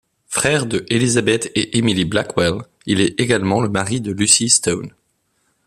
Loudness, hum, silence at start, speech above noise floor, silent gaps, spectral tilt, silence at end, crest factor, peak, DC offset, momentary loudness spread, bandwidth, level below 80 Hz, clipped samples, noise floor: -17 LUFS; none; 0.3 s; 49 dB; none; -3.5 dB/octave; 0.8 s; 18 dB; 0 dBFS; under 0.1%; 9 LU; 14.5 kHz; -50 dBFS; under 0.1%; -66 dBFS